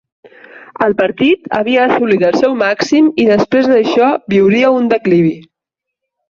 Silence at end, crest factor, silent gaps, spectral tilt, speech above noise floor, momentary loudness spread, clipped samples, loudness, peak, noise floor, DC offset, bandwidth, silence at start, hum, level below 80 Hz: 0.9 s; 12 dB; none; -6.5 dB/octave; 69 dB; 4 LU; under 0.1%; -12 LUFS; 0 dBFS; -80 dBFS; under 0.1%; 7.4 kHz; 0.55 s; none; -52 dBFS